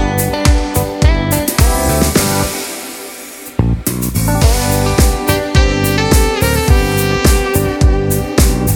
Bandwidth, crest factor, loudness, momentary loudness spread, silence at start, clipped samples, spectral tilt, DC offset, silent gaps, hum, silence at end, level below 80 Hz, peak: 19.5 kHz; 12 dB; -13 LUFS; 6 LU; 0 s; under 0.1%; -5 dB/octave; under 0.1%; none; none; 0 s; -16 dBFS; 0 dBFS